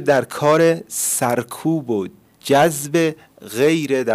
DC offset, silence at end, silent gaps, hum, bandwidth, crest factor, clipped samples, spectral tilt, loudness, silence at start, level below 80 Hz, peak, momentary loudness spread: under 0.1%; 0 s; none; none; 16 kHz; 12 dB; under 0.1%; -4.5 dB/octave; -18 LUFS; 0 s; -64 dBFS; -6 dBFS; 11 LU